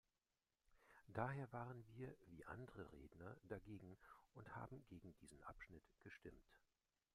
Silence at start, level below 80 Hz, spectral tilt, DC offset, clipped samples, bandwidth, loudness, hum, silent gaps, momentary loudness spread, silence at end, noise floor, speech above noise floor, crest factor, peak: 0.7 s; -74 dBFS; -7.5 dB/octave; under 0.1%; under 0.1%; 13.5 kHz; -57 LUFS; none; none; 15 LU; 0.55 s; under -90 dBFS; over 34 dB; 28 dB; -30 dBFS